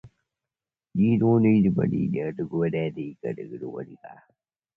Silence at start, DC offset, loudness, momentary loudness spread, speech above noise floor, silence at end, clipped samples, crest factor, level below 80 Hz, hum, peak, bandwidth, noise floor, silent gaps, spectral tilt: 0.05 s; under 0.1%; -24 LUFS; 16 LU; over 66 dB; 0.65 s; under 0.1%; 16 dB; -56 dBFS; none; -10 dBFS; 3.3 kHz; under -90 dBFS; none; -11 dB/octave